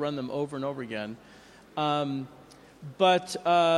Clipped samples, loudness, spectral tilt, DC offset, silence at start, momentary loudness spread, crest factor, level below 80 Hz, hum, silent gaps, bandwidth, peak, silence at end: under 0.1%; -28 LUFS; -5 dB/octave; under 0.1%; 0 s; 21 LU; 20 dB; -68 dBFS; none; none; 12.5 kHz; -10 dBFS; 0 s